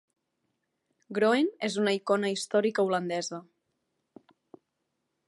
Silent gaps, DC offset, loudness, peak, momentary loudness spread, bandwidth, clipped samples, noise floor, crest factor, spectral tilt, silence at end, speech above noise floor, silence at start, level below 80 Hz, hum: none; under 0.1%; -28 LUFS; -12 dBFS; 10 LU; 11.5 kHz; under 0.1%; -81 dBFS; 20 dB; -4.5 dB/octave; 1.85 s; 54 dB; 1.1 s; -82 dBFS; none